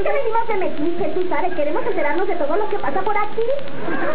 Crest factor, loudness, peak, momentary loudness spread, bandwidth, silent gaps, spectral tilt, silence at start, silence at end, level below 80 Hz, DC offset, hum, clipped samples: 12 dB; -22 LUFS; -6 dBFS; 3 LU; 4 kHz; none; -9 dB/octave; 0 s; 0 s; -54 dBFS; 20%; none; under 0.1%